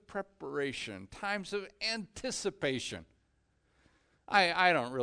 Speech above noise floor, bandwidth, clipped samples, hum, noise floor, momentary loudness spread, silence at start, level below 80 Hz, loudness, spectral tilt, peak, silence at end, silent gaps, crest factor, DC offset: 40 dB; 10 kHz; under 0.1%; none; -74 dBFS; 14 LU; 0.1 s; -66 dBFS; -33 LUFS; -3 dB/octave; -12 dBFS; 0 s; none; 24 dB; under 0.1%